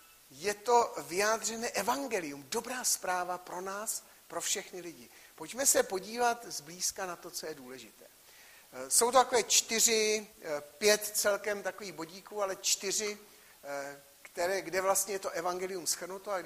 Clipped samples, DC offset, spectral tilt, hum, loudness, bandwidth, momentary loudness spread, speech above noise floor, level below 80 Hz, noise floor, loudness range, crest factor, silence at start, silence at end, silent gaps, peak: under 0.1%; under 0.1%; -0.5 dB/octave; none; -31 LUFS; 15.5 kHz; 18 LU; 24 dB; -72 dBFS; -57 dBFS; 7 LU; 24 dB; 0.3 s; 0 s; none; -10 dBFS